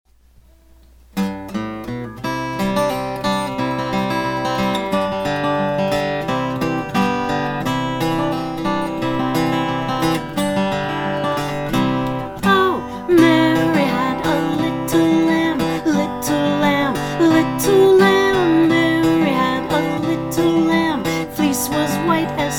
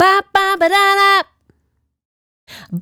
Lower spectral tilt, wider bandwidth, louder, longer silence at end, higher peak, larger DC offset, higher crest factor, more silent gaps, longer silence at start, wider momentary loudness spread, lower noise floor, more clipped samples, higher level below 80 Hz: first, -5.5 dB/octave vs -3 dB/octave; about the same, 18.5 kHz vs over 20 kHz; second, -18 LUFS vs -12 LUFS; about the same, 0 s vs 0 s; about the same, 0 dBFS vs 0 dBFS; neither; about the same, 18 dB vs 16 dB; second, none vs 2.05-2.47 s; first, 1.15 s vs 0 s; second, 8 LU vs 14 LU; second, -50 dBFS vs -66 dBFS; neither; first, -44 dBFS vs -56 dBFS